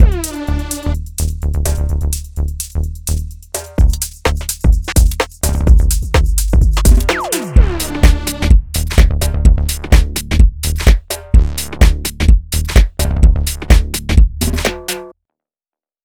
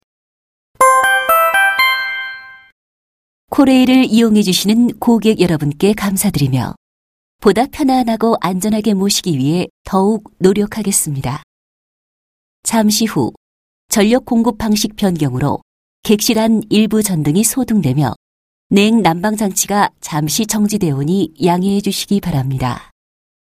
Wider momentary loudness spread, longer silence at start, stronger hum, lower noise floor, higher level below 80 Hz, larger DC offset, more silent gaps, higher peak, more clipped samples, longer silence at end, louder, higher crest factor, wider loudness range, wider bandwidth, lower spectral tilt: about the same, 8 LU vs 9 LU; second, 0 s vs 0.8 s; neither; about the same, under -90 dBFS vs under -90 dBFS; first, -14 dBFS vs -44 dBFS; neither; second, none vs 2.72-3.48 s, 6.77-7.39 s, 9.70-9.85 s, 11.43-12.63 s, 13.37-13.89 s, 15.62-16.03 s, 18.16-18.70 s; about the same, 0 dBFS vs 0 dBFS; first, 0.7% vs under 0.1%; first, 0.95 s vs 0.65 s; about the same, -15 LUFS vs -14 LUFS; about the same, 12 dB vs 14 dB; about the same, 5 LU vs 4 LU; first, 17.5 kHz vs 15.5 kHz; about the same, -5 dB/octave vs -4.5 dB/octave